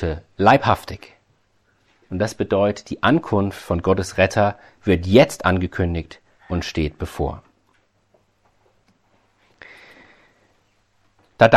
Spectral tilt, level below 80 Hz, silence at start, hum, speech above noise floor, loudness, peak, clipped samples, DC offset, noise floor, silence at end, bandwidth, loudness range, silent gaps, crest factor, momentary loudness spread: -6 dB/octave; -40 dBFS; 0 s; none; 43 dB; -20 LUFS; 0 dBFS; under 0.1%; under 0.1%; -63 dBFS; 0 s; 14.5 kHz; 11 LU; none; 20 dB; 14 LU